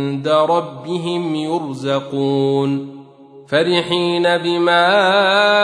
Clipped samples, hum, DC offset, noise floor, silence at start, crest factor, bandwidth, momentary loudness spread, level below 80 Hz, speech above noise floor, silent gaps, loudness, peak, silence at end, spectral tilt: under 0.1%; none; under 0.1%; -41 dBFS; 0 s; 16 dB; 10.5 kHz; 9 LU; -68 dBFS; 25 dB; none; -16 LUFS; -2 dBFS; 0 s; -5.5 dB/octave